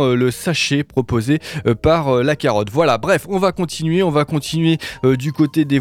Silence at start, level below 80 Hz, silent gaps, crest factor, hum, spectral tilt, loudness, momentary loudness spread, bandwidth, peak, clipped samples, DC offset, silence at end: 0 s; -40 dBFS; none; 14 dB; none; -6 dB/octave; -17 LUFS; 4 LU; 16.5 kHz; -2 dBFS; under 0.1%; under 0.1%; 0 s